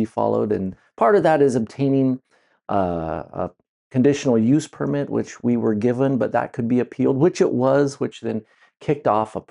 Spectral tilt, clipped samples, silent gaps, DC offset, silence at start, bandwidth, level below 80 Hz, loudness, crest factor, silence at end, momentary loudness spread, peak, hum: -7.5 dB/octave; under 0.1%; 3.69-3.90 s; under 0.1%; 0 s; 11 kHz; -58 dBFS; -21 LUFS; 16 dB; 0.1 s; 11 LU; -4 dBFS; none